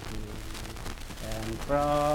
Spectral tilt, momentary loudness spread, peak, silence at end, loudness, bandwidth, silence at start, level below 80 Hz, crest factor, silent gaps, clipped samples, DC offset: -5 dB/octave; 13 LU; -14 dBFS; 0 s; -33 LUFS; 18.5 kHz; 0 s; -40 dBFS; 18 dB; none; under 0.1%; under 0.1%